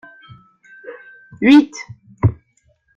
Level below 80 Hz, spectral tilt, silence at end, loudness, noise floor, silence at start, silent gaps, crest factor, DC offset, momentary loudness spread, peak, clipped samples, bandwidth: -46 dBFS; -6.5 dB/octave; 0.65 s; -15 LUFS; -61 dBFS; 0.85 s; none; 18 dB; under 0.1%; 26 LU; -2 dBFS; under 0.1%; 7.6 kHz